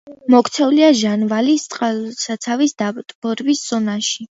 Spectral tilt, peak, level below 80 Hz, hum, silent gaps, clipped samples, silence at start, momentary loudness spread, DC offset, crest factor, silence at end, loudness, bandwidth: -4 dB/octave; 0 dBFS; -68 dBFS; none; 3.15-3.22 s; under 0.1%; 0.05 s; 11 LU; under 0.1%; 16 dB; 0.1 s; -17 LUFS; 8 kHz